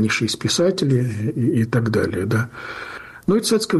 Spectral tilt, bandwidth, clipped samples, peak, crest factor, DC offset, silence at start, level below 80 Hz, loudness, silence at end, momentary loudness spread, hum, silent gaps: -5 dB/octave; 12.5 kHz; under 0.1%; -6 dBFS; 12 dB; under 0.1%; 0 s; -52 dBFS; -20 LUFS; 0 s; 12 LU; none; none